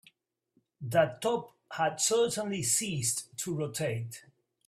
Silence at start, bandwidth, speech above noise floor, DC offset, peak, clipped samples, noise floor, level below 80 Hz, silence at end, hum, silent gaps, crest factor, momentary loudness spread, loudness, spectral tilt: 0.8 s; 16 kHz; 43 dB; under 0.1%; -12 dBFS; under 0.1%; -74 dBFS; -70 dBFS; 0.45 s; none; none; 20 dB; 13 LU; -30 LUFS; -3.5 dB/octave